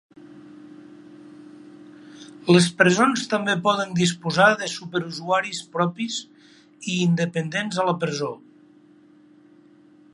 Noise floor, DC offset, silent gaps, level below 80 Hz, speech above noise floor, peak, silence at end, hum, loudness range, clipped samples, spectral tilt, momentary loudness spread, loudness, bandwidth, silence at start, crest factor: -53 dBFS; under 0.1%; none; -68 dBFS; 31 dB; -2 dBFS; 1.75 s; none; 6 LU; under 0.1%; -4.5 dB/octave; 14 LU; -22 LUFS; 11.5 kHz; 0.35 s; 22 dB